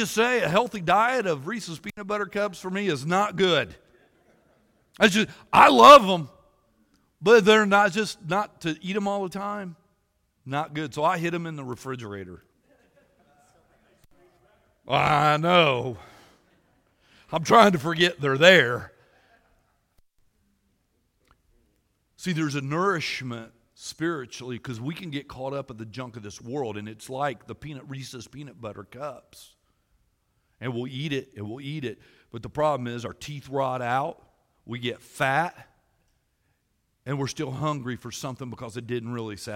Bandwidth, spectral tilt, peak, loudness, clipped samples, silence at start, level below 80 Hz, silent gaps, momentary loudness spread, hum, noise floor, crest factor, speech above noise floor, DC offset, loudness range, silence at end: 16.5 kHz; -4.5 dB/octave; 0 dBFS; -23 LUFS; under 0.1%; 0 s; -60 dBFS; none; 21 LU; none; -73 dBFS; 26 dB; 49 dB; under 0.1%; 18 LU; 0 s